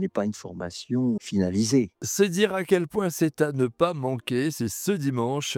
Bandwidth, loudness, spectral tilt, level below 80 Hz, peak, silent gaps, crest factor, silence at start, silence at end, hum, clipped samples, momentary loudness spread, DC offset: 18.5 kHz; -25 LUFS; -5 dB/octave; -62 dBFS; -6 dBFS; none; 18 dB; 0 s; 0 s; none; under 0.1%; 7 LU; under 0.1%